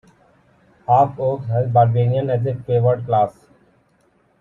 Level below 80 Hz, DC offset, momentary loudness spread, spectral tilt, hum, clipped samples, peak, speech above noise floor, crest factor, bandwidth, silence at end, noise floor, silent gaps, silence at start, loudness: -56 dBFS; under 0.1%; 7 LU; -10 dB/octave; none; under 0.1%; -2 dBFS; 43 dB; 18 dB; 3.8 kHz; 1.1 s; -60 dBFS; none; 0.9 s; -18 LUFS